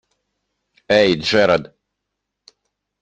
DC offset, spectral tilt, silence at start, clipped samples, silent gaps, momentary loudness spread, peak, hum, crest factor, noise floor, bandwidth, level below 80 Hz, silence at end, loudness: under 0.1%; -5 dB/octave; 0.9 s; under 0.1%; none; 4 LU; -2 dBFS; 50 Hz at -50 dBFS; 20 dB; -79 dBFS; 9 kHz; -56 dBFS; 1.4 s; -16 LUFS